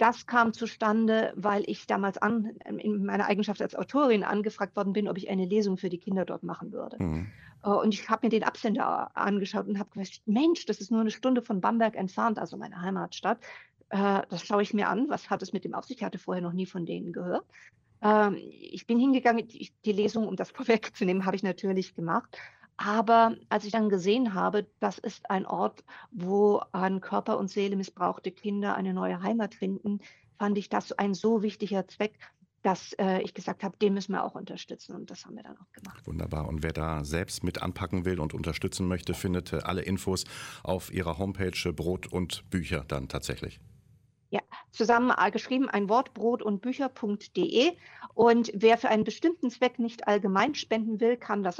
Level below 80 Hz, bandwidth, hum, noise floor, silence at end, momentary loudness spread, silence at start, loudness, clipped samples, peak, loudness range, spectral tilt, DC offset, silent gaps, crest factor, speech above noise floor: -54 dBFS; 16 kHz; none; -63 dBFS; 0 s; 11 LU; 0 s; -29 LUFS; under 0.1%; -10 dBFS; 6 LU; -6 dB/octave; under 0.1%; none; 20 dB; 34 dB